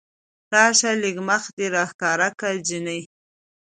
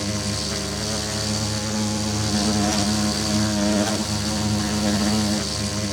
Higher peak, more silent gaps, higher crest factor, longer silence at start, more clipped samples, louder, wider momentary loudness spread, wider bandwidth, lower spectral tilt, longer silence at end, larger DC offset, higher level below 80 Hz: first, -2 dBFS vs -8 dBFS; first, 1.53-1.57 s, 1.94-1.99 s vs none; first, 22 dB vs 16 dB; first, 0.5 s vs 0 s; neither; about the same, -21 LUFS vs -22 LUFS; first, 11 LU vs 4 LU; second, 9.6 kHz vs 18.5 kHz; second, -2 dB/octave vs -4 dB/octave; first, 0.65 s vs 0 s; neither; second, -72 dBFS vs -40 dBFS